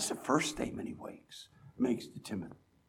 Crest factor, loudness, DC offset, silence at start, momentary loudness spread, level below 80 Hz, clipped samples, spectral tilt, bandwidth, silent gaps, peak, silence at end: 22 dB; -36 LUFS; under 0.1%; 0 s; 19 LU; -64 dBFS; under 0.1%; -4 dB/octave; 17 kHz; none; -14 dBFS; 0.35 s